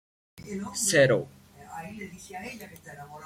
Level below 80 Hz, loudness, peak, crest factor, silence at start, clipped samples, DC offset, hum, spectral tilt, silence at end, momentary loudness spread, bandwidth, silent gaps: -64 dBFS; -24 LUFS; -8 dBFS; 22 dB; 0.35 s; under 0.1%; under 0.1%; none; -3.5 dB/octave; 0 s; 23 LU; 16.5 kHz; none